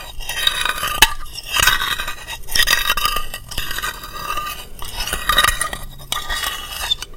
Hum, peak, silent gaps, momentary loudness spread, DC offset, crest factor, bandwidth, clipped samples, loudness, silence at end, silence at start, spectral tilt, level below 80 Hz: none; 0 dBFS; none; 13 LU; under 0.1%; 20 dB; 17 kHz; under 0.1%; -18 LUFS; 0 s; 0 s; 0 dB/octave; -30 dBFS